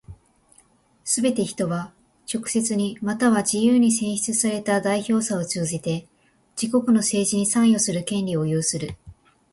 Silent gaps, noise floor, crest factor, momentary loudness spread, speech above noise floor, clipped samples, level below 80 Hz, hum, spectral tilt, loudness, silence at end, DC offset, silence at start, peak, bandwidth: none; -58 dBFS; 16 dB; 12 LU; 37 dB; under 0.1%; -58 dBFS; none; -4.5 dB/octave; -22 LUFS; 0.4 s; under 0.1%; 0.1 s; -8 dBFS; 11.5 kHz